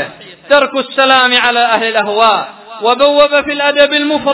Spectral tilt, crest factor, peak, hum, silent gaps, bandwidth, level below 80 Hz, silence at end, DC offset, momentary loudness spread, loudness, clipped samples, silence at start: -6.5 dB/octave; 12 dB; 0 dBFS; none; none; 4 kHz; -52 dBFS; 0 s; under 0.1%; 7 LU; -10 LUFS; 0.9%; 0 s